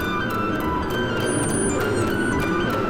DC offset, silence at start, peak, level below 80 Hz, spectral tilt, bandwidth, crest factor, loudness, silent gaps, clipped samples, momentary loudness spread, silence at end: under 0.1%; 0 s; -10 dBFS; -38 dBFS; -4.5 dB/octave; 17 kHz; 12 dB; -22 LUFS; none; under 0.1%; 2 LU; 0 s